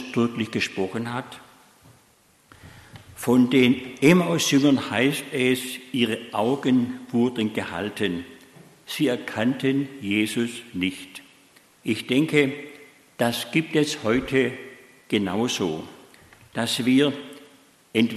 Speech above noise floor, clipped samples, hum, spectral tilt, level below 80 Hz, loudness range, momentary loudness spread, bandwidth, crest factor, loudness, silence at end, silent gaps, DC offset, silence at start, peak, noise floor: 36 dB; under 0.1%; none; -5 dB/octave; -60 dBFS; 6 LU; 16 LU; 13 kHz; 20 dB; -23 LUFS; 0 s; none; under 0.1%; 0 s; -4 dBFS; -59 dBFS